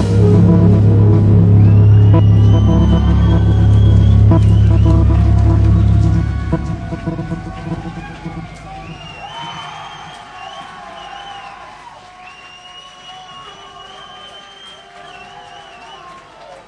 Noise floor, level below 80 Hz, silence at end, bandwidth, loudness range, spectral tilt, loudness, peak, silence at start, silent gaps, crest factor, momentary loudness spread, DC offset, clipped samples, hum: -37 dBFS; -20 dBFS; 0.55 s; 6.4 kHz; 24 LU; -9 dB/octave; -11 LUFS; -2 dBFS; 0 s; none; 12 dB; 24 LU; under 0.1%; under 0.1%; none